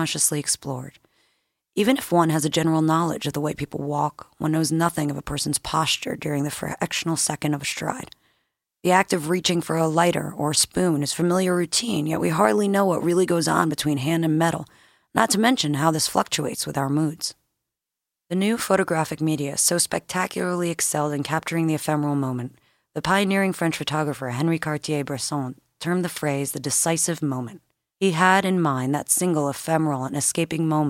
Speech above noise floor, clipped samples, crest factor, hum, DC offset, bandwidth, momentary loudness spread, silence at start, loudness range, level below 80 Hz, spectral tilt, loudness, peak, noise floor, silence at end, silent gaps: 64 dB; under 0.1%; 20 dB; none; under 0.1%; 16.5 kHz; 8 LU; 0 s; 4 LU; -56 dBFS; -4 dB/octave; -23 LUFS; -2 dBFS; -86 dBFS; 0 s; none